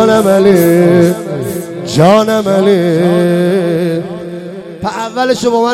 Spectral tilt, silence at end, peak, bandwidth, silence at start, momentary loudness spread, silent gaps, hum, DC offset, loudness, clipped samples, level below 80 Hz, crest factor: -6.5 dB/octave; 0 s; 0 dBFS; 16.5 kHz; 0 s; 13 LU; none; none; under 0.1%; -11 LUFS; under 0.1%; -48 dBFS; 10 dB